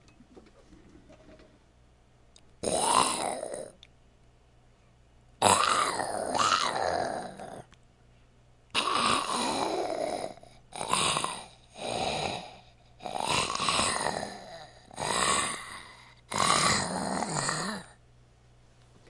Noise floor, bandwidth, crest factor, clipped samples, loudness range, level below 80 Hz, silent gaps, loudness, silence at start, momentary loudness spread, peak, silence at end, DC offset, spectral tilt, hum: -60 dBFS; 12 kHz; 26 dB; under 0.1%; 4 LU; -60 dBFS; none; -28 LUFS; 0.35 s; 20 LU; -6 dBFS; 1.15 s; under 0.1%; -2 dB/octave; none